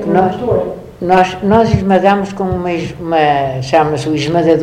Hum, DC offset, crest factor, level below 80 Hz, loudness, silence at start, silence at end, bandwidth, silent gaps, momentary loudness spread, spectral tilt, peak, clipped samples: none; under 0.1%; 12 dB; -36 dBFS; -13 LUFS; 0 s; 0 s; 10.5 kHz; none; 7 LU; -7 dB/octave; 0 dBFS; 0.2%